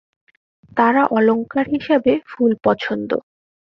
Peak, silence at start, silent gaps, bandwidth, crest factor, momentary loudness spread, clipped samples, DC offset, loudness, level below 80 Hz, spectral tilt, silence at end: -2 dBFS; 0.75 s; none; 6 kHz; 16 dB; 8 LU; under 0.1%; under 0.1%; -18 LUFS; -58 dBFS; -8 dB/octave; 0.55 s